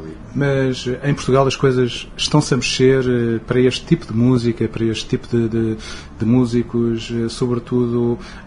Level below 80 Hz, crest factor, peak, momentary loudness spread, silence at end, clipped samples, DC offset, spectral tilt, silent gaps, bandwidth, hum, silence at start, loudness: -38 dBFS; 18 dB; 0 dBFS; 7 LU; 0 s; under 0.1%; under 0.1%; -6 dB/octave; none; 10.5 kHz; none; 0 s; -18 LUFS